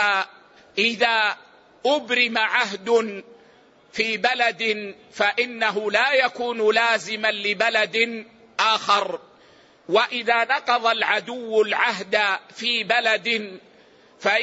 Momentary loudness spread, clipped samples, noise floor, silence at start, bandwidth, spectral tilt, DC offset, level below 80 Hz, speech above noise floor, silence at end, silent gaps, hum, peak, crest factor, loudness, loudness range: 9 LU; under 0.1%; -54 dBFS; 0 s; 8 kHz; -2.5 dB/octave; under 0.1%; -74 dBFS; 32 dB; 0 s; none; none; -6 dBFS; 18 dB; -21 LUFS; 2 LU